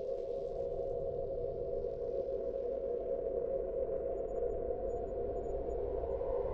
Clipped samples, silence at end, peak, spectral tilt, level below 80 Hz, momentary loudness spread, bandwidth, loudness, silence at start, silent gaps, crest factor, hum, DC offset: under 0.1%; 0 s; -24 dBFS; -9.5 dB/octave; -48 dBFS; 2 LU; 7.4 kHz; -38 LUFS; 0 s; none; 12 dB; none; under 0.1%